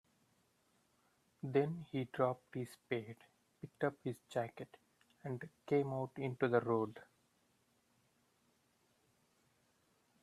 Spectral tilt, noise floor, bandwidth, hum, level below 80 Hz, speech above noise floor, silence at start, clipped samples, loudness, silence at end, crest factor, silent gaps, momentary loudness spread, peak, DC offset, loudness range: -7.5 dB/octave; -77 dBFS; 14 kHz; none; -82 dBFS; 38 dB; 1.45 s; under 0.1%; -40 LUFS; 3.2 s; 24 dB; none; 19 LU; -18 dBFS; under 0.1%; 5 LU